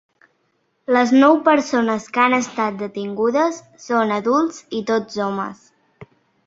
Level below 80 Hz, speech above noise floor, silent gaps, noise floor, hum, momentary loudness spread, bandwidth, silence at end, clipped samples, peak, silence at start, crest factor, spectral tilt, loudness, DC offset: -64 dBFS; 49 dB; none; -67 dBFS; none; 14 LU; 7.8 kHz; 0.45 s; under 0.1%; -2 dBFS; 0.9 s; 18 dB; -5 dB/octave; -18 LUFS; under 0.1%